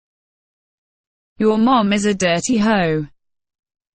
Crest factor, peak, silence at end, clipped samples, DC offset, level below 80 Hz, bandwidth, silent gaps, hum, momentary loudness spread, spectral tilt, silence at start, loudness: 16 dB; -4 dBFS; 0.9 s; under 0.1%; under 0.1%; -50 dBFS; 9.4 kHz; none; none; 6 LU; -5 dB/octave; 1.4 s; -17 LUFS